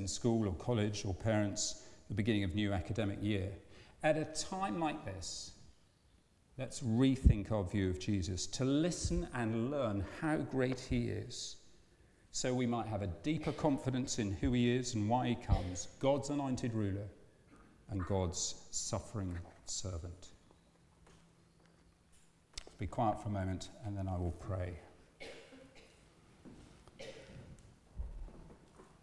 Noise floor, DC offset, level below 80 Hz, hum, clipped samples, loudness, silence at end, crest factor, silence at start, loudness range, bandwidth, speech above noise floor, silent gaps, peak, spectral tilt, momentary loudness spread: -69 dBFS; under 0.1%; -50 dBFS; none; under 0.1%; -37 LUFS; 0.2 s; 24 dB; 0 s; 12 LU; 12 kHz; 33 dB; none; -14 dBFS; -5.5 dB/octave; 18 LU